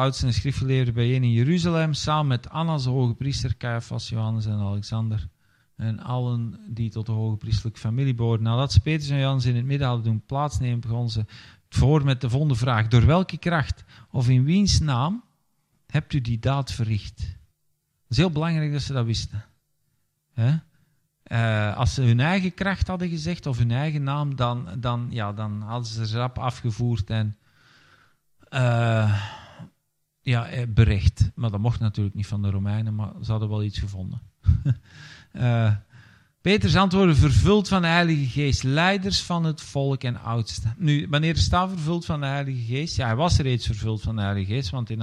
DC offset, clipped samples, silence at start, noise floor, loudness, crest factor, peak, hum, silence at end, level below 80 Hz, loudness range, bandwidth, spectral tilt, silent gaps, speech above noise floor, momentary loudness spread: under 0.1%; under 0.1%; 0 s; -73 dBFS; -24 LUFS; 20 dB; -4 dBFS; none; 0 s; -40 dBFS; 7 LU; 10.5 kHz; -6.5 dB/octave; none; 50 dB; 10 LU